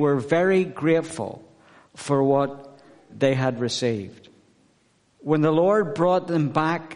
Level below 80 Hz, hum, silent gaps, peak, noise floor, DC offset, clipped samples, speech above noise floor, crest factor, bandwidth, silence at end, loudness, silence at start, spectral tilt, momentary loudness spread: -62 dBFS; none; none; -6 dBFS; -63 dBFS; under 0.1%; under 0.1%; 41 dB; 18 dB; 10.5 kHz; 0 s; -22 LUFS; 0 s; -6.5 dB/octave; 15 LU